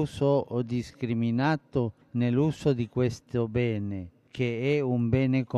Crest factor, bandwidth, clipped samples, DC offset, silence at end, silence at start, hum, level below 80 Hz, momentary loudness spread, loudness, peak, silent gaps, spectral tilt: 14 dB; 11 kHz; under 0.1%; under 0.1%; 0 s; 0 s; none; -54 dBFS; 7 LU; -28 LUFS; -12 dBFS; none; -8 dB/octave